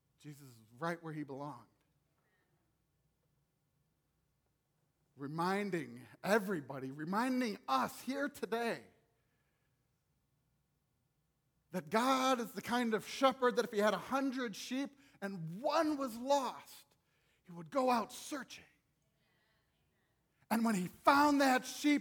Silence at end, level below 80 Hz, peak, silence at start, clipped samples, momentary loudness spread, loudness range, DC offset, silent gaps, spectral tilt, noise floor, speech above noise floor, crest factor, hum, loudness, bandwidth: 0 s; -80 dBFS; -14 dBFS; 0.25 s; under 0.1%; 16 LU; 14 LU; under 0.1%; none; -4.5 dB/octave; -81 dBFS; 45 dB; 24 dB; none; -36 LUFS; over 20 kHz